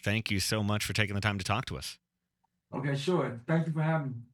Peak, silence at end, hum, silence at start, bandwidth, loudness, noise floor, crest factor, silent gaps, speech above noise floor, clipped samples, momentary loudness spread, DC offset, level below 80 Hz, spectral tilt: -10 dBFS; 0.1 s; none; 0.05 s; 19 kHz; -31 LUFS; -80 dBFS; 22 dB; none; 49 dB; under 0.1%; 8 LU; under 0.1%; -58 dBFS; -5 dB/octave